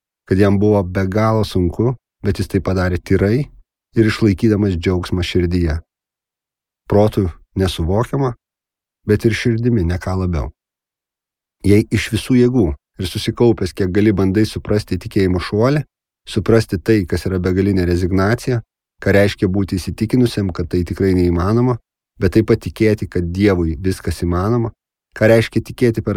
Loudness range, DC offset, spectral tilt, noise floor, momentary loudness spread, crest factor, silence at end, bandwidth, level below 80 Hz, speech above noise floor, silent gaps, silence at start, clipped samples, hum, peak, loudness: 3 LU; under 0.1%; -7 dB/octave; -87 dBFS; 7 LU; 16 dB; 0 s; 15.5 kHz; -36 dBFS; 71 dB; none; 0.3 s; under 0.1%; none; 0 dBFS; -17 LUFS